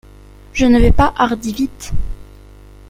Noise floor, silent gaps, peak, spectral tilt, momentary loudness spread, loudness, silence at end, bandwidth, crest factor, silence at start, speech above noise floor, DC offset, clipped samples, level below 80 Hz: -40 dBFS; none; 0 dBFS; -6 dB/octave; 16 LU; -16 LUFS; 0.65 s; 16 kHz; 14 dB; 0.55 s; 27 dB; under 0.1%; under 0.1%; -22 dBFS